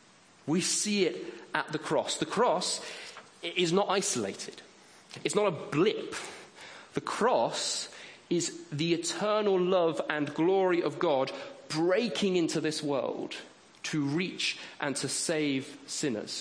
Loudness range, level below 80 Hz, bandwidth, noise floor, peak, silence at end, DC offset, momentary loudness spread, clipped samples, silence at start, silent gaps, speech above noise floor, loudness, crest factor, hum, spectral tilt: 3 LU; -76 dBFS; 10.5 kHz; -50 dBFS; -10 dBFS; 0 s; under 0.1%; 14 LU; under 0.1%; 0.45 s; none; 20 dB; -30 LUFS; 22 dB; none; -3.5 dB/octave